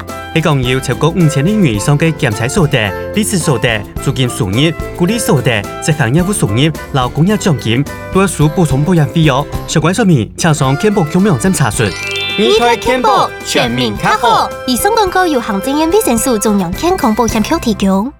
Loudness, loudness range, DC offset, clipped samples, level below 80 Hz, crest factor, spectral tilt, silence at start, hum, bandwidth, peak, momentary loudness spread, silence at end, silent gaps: -12 LUFS; 2 LU; 0.2%; under 0.1%; -32 dBFS; 12 dB; -5 dB/octave; 0 s; none; 18.5 kHz; 0 dBFS; 4 LU; 0.05 s; none